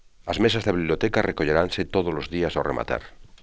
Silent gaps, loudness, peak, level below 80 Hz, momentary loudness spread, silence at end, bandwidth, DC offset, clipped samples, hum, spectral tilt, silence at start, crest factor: none; -24 LUFS; -4 dBFS; -42 dBFS; 6 LU; 0.05 s; 8 kHz; 0.2%; under 0.1%; none; -6 dB/octave; 0.25 s; 22 dB